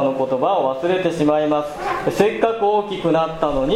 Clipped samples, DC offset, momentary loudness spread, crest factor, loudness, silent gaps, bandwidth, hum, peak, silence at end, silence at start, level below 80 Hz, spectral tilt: under 0.1%; under 0.1%; 4 LU; 16 dB; -19 LUFS; none; 15.5 kHz; none; -2 dBFS; 0 s; 0 s; -42 dBFS; -6 dB/octave